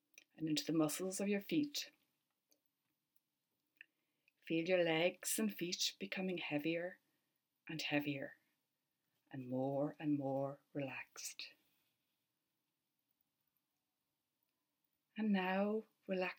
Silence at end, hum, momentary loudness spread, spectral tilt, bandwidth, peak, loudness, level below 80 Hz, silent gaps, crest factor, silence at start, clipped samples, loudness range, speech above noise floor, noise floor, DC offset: 0.05 s; none; 13 LU; -4 dB/octave; 18 kHz; -22 dBFS; -40 LUFS; under -90 dBFS; none; 22 dB; 0.4 s; under 0.1%; 10 LU; over 50 dB; under -90 dBFS; under 0.1%